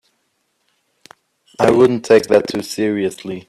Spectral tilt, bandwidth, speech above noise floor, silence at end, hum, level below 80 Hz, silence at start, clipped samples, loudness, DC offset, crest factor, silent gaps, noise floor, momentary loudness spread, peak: -5.5 dB/octave; 13.5 kHz; 52 dB; 0.1 s; none; -54 dBFS; 1.6 s; under 0.1%; -15 LUFS; under 0.1%; 18 dB; none; -67 dBFS; 10 LU; 0 dBFS